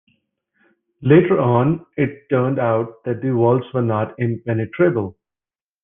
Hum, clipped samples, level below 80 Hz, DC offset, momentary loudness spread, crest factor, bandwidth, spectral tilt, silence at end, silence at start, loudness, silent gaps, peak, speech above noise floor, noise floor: none; under 0.1%; -56 dBFS; under 0.1%; 10 LU; 18 dB; 3.7 kHz; -12 dB/octave; 0.7 s; 1 s; -19 LUFS; none; -2 dBFS; over 72 dB; under -90 dBFS